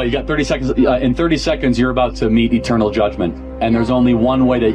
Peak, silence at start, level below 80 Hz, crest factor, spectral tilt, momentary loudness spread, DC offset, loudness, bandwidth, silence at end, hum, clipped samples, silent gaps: -4 dBFS; 0 s; -30 dBFS; 12 dB; -6.5 dB/octave; 4 LU; under 0.1%; -15 LUFS; 9.4 kHz; 0 s; none; under 0.1%; none